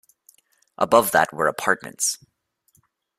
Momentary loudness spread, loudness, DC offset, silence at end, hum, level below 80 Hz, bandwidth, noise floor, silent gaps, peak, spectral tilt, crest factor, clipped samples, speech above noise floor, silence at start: 8 LU; -21 LUFS; under 0.1%; 1.05 s; none; -64 dBFS; 16 kHz; -66 dBFS; none; -2 dBFS; -2.5 dB/octave; 22 dB; under 0.1%; 45 dB; 0.8 s